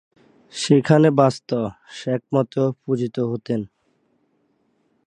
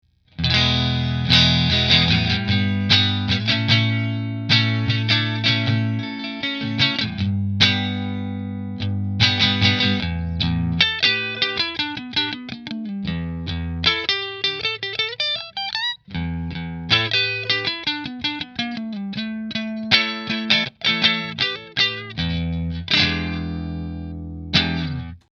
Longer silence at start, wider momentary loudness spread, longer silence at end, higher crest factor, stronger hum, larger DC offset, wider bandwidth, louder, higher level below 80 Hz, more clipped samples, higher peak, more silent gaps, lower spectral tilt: first, 0.55 s vs 0.4 s; about the same, 14 LU vs 12 LU; first, 1.4 s vs 0.15 s; about the same, 20 dB vs 22 dB; neither; neither; first, 10.5 kHz vs 7.2 kHz; about the same, -21 LUFS vs -20 LUFS; second, -62 dBFS vs -40 dBFS; neither; about the same, 0 dBFS vs 0 dBFS; neither; first, -6.5 dB/octave vs -5 dB/octave